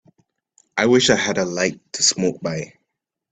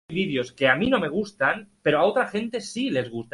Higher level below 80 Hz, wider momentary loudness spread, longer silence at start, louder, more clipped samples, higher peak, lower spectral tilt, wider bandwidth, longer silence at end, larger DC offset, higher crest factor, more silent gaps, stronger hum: about the same, -58 dBFS vs -58 dBFS; first, 13 LU vs 7 LU; first, 0.75 s vs 0.1 s; first, -19 LUFS vs -24 LUFS; neither; first, 0 dBFS vs -6 dBFS; second, -3 dB/octave vs -5 dB/octave; second, 9.2 kHz vs 11.5 kHz; first, 0.65 s vs 0.1 s; neither; about the same, 20 dB vs 20 dB; neither; neither